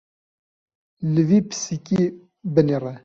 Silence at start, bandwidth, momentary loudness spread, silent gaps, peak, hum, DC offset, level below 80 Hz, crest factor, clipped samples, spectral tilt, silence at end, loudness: 1 s; 7.8 kHz; 10 LU; none; -2 dBFS; none; under 0.1%; -60 dBFS; 20 dB; under 0.1%; -7 dB/octave; 0.05 s; -21 LUFS